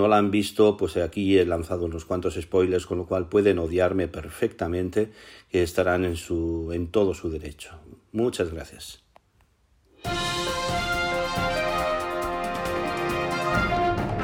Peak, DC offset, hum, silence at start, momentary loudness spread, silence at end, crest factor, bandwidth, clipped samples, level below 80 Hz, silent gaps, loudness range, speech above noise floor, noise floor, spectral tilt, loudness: -6 dBFS; under 0.1%; none; 0 s; 10 LU; 0 s; 18 dB; 18.5 kHz; under 0.1%; -44 dBFS; none; 6 LU; 39 dB; -63 dBFS; -5.5 dB/octave; -25 LUFS